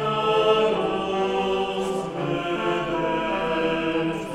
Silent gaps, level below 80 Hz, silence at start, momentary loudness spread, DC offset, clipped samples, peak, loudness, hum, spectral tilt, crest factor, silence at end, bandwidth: none; -50 dBFS; 0 s; 7 LU; under 0.1%; under 0.1%; -8 dBFS; -24 LUFS; none; -5.5 dB/octave; 16 dB; 0 s; 12.5 kHz